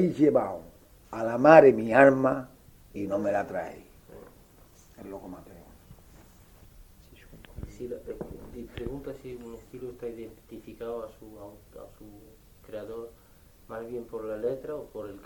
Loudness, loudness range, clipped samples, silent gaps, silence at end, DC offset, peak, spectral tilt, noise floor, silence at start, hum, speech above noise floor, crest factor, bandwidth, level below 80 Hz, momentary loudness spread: -25 LUFS; 24 LU; under 0.1%; none; 0.05 s; under 0.1%; -2 dBFS; -7.5 dB/octave; -56 dBFS; 0 s; none; 29 dB; 26 dB; 19 kHz; -54 dBFS; 27 LU